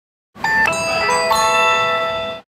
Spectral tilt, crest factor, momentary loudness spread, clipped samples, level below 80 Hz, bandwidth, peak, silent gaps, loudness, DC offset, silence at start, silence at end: -1.5 dB/octave; 14 dB; 8 LU; under 0.1%; -48 dBFS; 16 kHz; -4 dBFS; none; -16 LUFS; under 0.1%; 0.35 s; 0.1 s